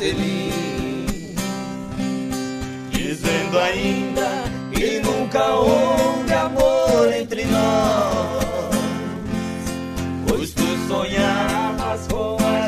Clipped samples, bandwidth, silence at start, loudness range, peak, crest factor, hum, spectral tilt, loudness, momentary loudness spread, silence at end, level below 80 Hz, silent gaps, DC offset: under 0.1%; 15.5 kHz; 0 s; 5 LU; -4 dBFS; 16 dB; none; -5 dB/octave; -21 LUFS; 10 LU; 0 s; -36 dBFS; none; under 0.1%